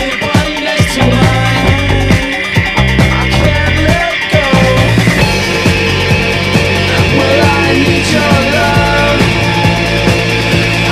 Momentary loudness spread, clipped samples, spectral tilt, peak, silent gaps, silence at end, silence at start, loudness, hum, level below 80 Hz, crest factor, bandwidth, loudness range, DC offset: 3 LU; 0.2%; -5 dB/octave; 0 dBFS; none; 0 s; 0 s; -10 LUFS; none; -20 dBFS; 10 dB; 16 kHz; 1 LU; 0.3%